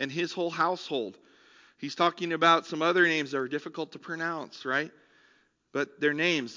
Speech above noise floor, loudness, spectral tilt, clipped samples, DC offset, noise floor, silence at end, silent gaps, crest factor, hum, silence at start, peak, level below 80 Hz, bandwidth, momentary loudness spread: 37 dB; -28 LUFS; -4.5 dB/octave; under 0.1%; under 0.1%; -66 dBFS; 0 s; none; 22 dB; none; 0 s; -8 dBFS; -86 dBFS; 7.6 kHz; 15 LU